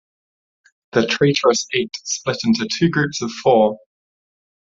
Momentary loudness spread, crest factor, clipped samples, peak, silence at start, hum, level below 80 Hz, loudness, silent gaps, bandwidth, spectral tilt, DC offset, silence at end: 7 LU; 18 dB; under 0.1%; -2 dBFS; 0.95 s; none; -58 dBFS; -18 LUFS; none; 7.8 kHz; -4.5 dB/octave; under 0.1%; 0.9 s